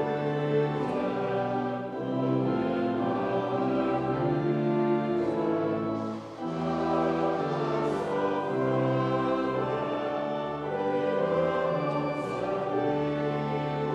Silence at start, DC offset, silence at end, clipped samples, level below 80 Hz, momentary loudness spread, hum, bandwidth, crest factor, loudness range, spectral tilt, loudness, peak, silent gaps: 0 s; under 0.1%; 0 s; under 0.1%; -60 dBFS; 4 LU; none; 9.4 kHz; 12 dB; 1 LU; -8 dB/octave; -29 LUFS; -16 dBFS; none